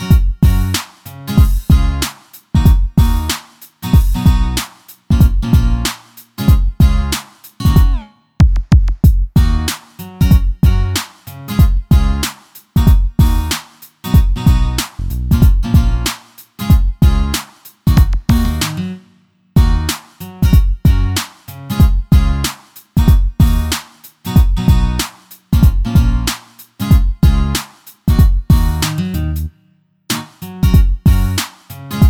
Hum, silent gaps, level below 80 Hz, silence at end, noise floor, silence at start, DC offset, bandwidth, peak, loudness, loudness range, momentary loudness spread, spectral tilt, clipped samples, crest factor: none; none; -14 dBFS; 0 s; -55 dBFS; 0 s; under 0.1%; 18.5 kHz; 0 dBFS; -15 LUFS; 2 LU; 12 LU; -5.5 dB/octave; under 0.1%; 12 dB